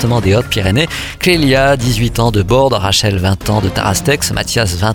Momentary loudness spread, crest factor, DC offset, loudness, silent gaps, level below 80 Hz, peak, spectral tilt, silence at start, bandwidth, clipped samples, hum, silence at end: 4 LU; 12 dB; under 0.1%; -13 LUFS; none; -28 dBFS; 0 dBFS; -4.5 dB/octave; 0 s; 19 kHz; under 0.1%; none; 0 s